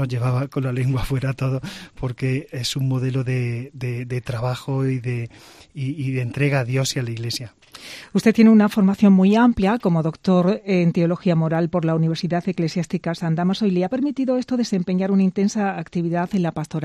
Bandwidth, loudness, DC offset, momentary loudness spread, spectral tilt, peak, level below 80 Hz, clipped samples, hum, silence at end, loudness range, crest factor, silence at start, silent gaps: 13.5 kHz; -21 LUFS; under 0.1%; 13 LU; -7 dB/octave; -4 dBFS; -46 dBFS; under 0.1%; none; 0 s; 8 LU; 16 dB; 0 s; none